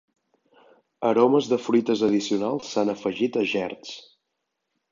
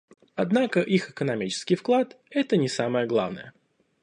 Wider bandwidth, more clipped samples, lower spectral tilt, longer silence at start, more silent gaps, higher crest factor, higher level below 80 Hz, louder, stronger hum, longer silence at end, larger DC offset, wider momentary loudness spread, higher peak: second, 7.6 kHz vs 10.5 kHz; neither; about the same, -5.5 dB/octave vs -5.5 dB/octave; first, 1 s vs 0.35 s; neither; about the same, 20 dB vs 18 dB; about the same, -70 dBFS vs -70 dBFS; about the same, -23 LUFS vs -25 LUFS; neither; first, 0.9 s vs 0.5 s; neither; first, 12 LU vs 7 LU; about the same, -6 dBFS vs -8 dBFS